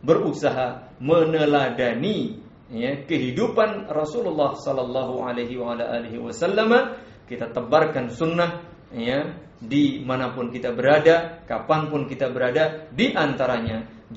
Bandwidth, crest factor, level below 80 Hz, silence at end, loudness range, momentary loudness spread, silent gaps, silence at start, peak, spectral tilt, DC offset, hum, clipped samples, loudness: 8 kHz; 20 dB; -56 dBFS; 0 s; 3 LU; 11 LU; none; 0.05 s; -2 dBFS; -4.5 dB/octave; under 0.1%; none; under 0.1%; -23 LUFS